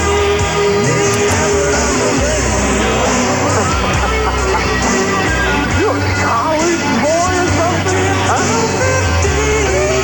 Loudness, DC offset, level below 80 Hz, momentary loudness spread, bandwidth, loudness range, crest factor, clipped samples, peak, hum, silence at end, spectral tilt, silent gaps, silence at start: -13 LUFS; 0.4%; -24 dBFS; 1 LU; 17.5 kHz; 1 LU; 14 dB; under 0.1%; 0 dBFS; none; 0 s; -4 dB/octave; none; 0 s